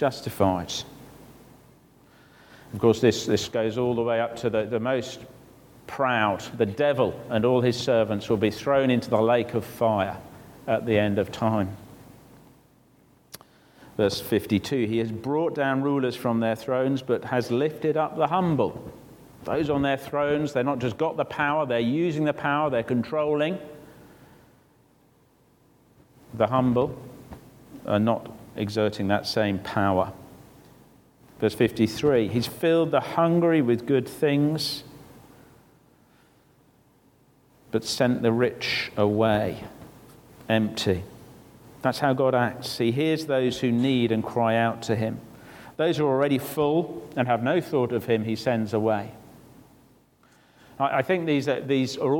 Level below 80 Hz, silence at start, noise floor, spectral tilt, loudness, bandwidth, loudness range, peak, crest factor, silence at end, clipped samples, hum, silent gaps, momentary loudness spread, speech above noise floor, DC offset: -58 dBFS; 0 s; -61 dBFS; -6 dB/octave; -25 LUFS; 18.5 kHz; 6 LU; -6 dBFS; 18 dB; 0 s; under 0.1%; none; none; 10 LU; 37 dB; under 0.1%